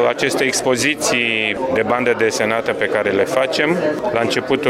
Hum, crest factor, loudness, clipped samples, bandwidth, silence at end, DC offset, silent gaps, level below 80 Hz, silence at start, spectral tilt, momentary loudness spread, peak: none; 16 dB; -17 LUFS; under 0.1%; 16 kHz; 0 s; under 0.1%; none; -52 dBFS; 0 s; -3 dB/octave; 3 LU; -2 dBFS